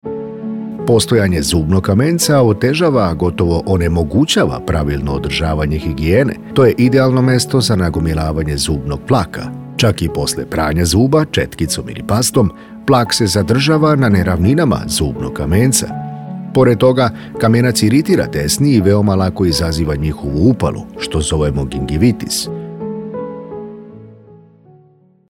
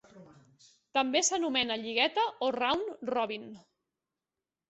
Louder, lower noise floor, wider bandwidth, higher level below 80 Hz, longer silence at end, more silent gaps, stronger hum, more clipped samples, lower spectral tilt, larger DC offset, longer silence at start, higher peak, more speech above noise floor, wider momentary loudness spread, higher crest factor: first, -14 LUFS vs -30 LUFS; second, -49 dBFS vs under -90 dBFS; first, 17.5 kHz vs 8.6 kHz; first, -32 dBFS vs -72 dBFS; second, 0.95 s vs 1.1 s; neither; neither; neither; first, -5.5 dB/octave vs -1 dB/octave; neither; about the same, 0.05 s vs 0.15 s; first, 0 dBFS vs -12 dBFS; second, 36 dB vs over 59 dB; first, 12 LU vs 7 LU; second, 14 dB vs 20 dB